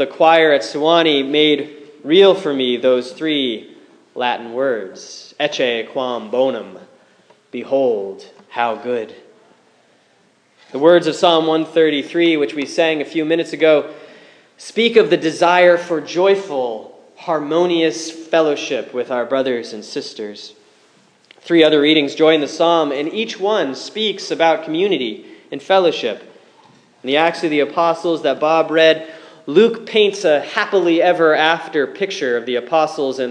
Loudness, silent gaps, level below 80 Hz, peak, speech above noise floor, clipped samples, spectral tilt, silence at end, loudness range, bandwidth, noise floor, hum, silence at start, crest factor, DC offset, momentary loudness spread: -16 LUFS; none; -76 dBFS; 0 dBFS; 40 dB; under 0.1%; -4.5 dB/octave; 0 s; 6 LU; 10 kHz; -56 dBFS; none; 0 s; 16 dB; under 0.1%; 16 LU